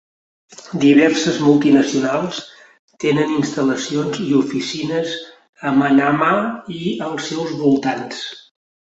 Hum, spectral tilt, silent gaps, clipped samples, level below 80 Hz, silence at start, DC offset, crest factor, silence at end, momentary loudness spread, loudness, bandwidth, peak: none; -5 dB/octave; 2.79-2.88 s, 5.49-5.53 s; under 0.1%; -60 dBFS; 0.6 s; under 0.1%; 16 dB; 0.5 s; 13 LU; -17 LUFS; 8 kHz; -2 dBFS